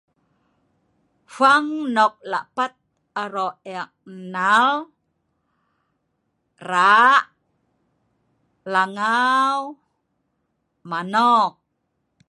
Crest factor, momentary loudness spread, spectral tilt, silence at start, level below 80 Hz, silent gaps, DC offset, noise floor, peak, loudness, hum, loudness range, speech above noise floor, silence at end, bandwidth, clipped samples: 20 dB; 18 LU; -3.5 dB/octave; 1.3 s; -76 dBFS; none; under 0.1%; -73 dBFS; -2 dBFS; -19 LUFS; none; 5 LU; 54 dB; 0.8 s; 11.5 kHz; under 0.1%